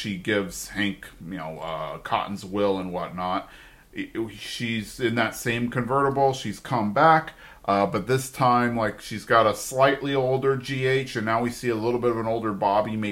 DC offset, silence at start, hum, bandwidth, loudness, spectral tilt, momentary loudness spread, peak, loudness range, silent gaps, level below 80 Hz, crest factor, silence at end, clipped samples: under 0.1%; 0 s; none; 16.5 kHz; -24 LUFS; -5 dB/octave; 12 LU; -4 dBFS; 7 LU; none; -52 dBFS; 20 dB; 0 s; under 0.1%